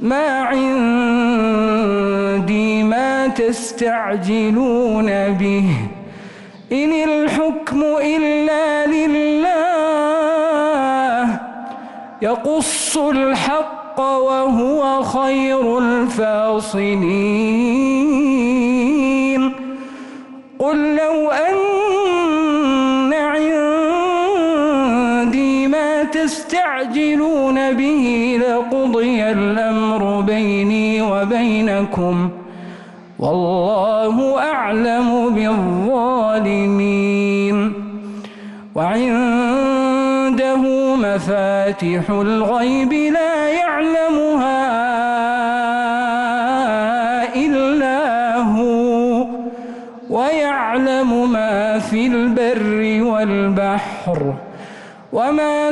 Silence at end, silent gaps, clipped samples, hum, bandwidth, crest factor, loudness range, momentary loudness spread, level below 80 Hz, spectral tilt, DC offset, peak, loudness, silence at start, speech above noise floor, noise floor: 0 s; none; under 0.1%; none; 11.5 kHz; 8 dB; 2 LU; 6 LU; -48 dBFS; -5.5 dB/octave; under 0.1%; -8 dBFS; -16 LUFS; 0 s; 21 dB; -37 dBFS